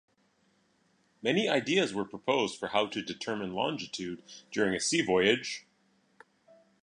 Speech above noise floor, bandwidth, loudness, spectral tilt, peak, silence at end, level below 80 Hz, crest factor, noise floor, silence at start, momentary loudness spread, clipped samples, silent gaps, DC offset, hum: 40 dB; 11 kHz; -30 LUFS; -3.5 dB/octave; -10 dBFS; 1.25 s; -70 dBFS; 24 dB; -70 dBFS; 1.25 s; 12 LU; under 0.1%; none; under 0.1%; none